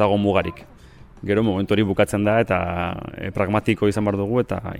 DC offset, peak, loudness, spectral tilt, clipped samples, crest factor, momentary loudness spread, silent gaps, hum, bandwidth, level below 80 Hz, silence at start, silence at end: under 0.1%; -4 dBFS; -21 LUFS; -7 dB/octave; under 0.1%; 16 dB; 9 LU; none; none; 15.5 kHz; -44 dBFS; 0 s; 0 s